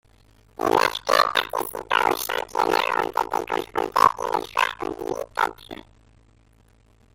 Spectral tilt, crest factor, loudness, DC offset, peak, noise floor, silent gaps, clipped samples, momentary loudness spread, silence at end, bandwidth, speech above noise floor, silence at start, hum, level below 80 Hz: -2.5 dB/octave; 22 dB; -23 LUFS; under 0.1%; -2 dBFS; -57 dBFS; none; under 0.1%; 11 LU; 1.4 s; 17 kHz; 33 dB; 0.6 s; none; -54 dBFS